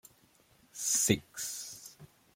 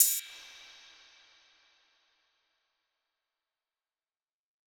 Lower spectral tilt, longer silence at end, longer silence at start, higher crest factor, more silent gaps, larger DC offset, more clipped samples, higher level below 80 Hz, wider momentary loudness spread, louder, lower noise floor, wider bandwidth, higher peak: first, -2.5 dB/octave vs 5.5 dB/octave; second, 0.3 s vs 4.3 s; first, 0.75 s vs 0 s; second, 26 dB vs 34 dB; neither; neither; neither; first, -66 dBFS vs -90 dBFS; second, 22 LU vs 26 LU; about the same, -31 LUFS vs -29 LUFS; second, -66 dBFS vs under -90 dBFS; second, 16.5 kHz vs over 20 kHz; second, -10 dBFS vs -6 dBFS